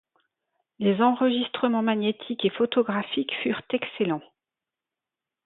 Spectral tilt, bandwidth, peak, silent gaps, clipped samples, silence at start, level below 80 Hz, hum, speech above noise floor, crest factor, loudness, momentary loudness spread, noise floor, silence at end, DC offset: -10 dB/octave; 4.1 kHz; -8 dBFS; none; under 0.1%; 0.8 s; -72 dBFS; none; 64 dB; 18 dB; -25 LUFS; 7 LU; -89 dBFS; 1.25 s; under 0.1%